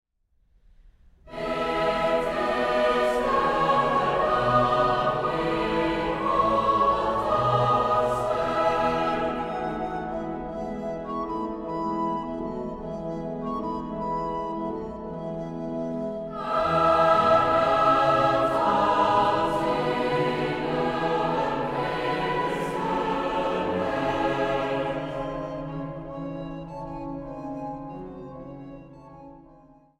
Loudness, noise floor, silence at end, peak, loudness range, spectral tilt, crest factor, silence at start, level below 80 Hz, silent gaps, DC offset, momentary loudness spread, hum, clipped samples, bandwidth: -25 LUFS; -66 dBFS; 0.45 s; -8 dBFS; 10 LU; -6.5 dB/octave; 18 dB; 1.25 s; -48 dBFS; none; under 0.1%; 14 LU; none; under 0.1%; 13 kHz